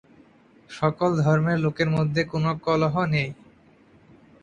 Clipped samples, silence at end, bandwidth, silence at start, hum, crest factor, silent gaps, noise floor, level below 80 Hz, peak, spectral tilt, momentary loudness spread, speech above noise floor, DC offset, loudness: under 0.1%; 1.1 s; 7.6 kHz; 0.7 s; none; 18 dB; none; -55 dBFS; -56 dBFS; -6 dBFS; -7.5 dB/octave; 5 LU; 33 dB; under 0.1%; -23 LUFS